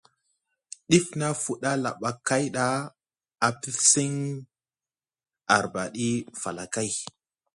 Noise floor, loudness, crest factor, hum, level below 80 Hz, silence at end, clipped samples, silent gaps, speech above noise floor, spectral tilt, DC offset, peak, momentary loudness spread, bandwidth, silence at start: under -90 dBFS; -26 LUFS; 24 dB; none; -64 dBFS; 0.5 s; under 0.1%; none; over 64 dB; -3.5 dB/octave; under 0.1%; -4 dBFS; 15 LU; 11.5 kHz; 0.9 s